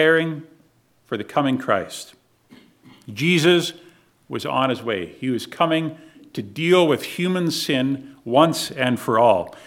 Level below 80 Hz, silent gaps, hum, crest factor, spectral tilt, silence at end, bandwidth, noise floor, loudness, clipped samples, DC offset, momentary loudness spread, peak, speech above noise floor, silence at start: -66 dBFS; none; none; 20 dB; -5 dB/octave; 0.05 s; 17 kHz; -59 dBFS; -21 LUFS; under 0.1%; under 0.1%; 16 LU; -2 dBFS; 39 dB; 0 s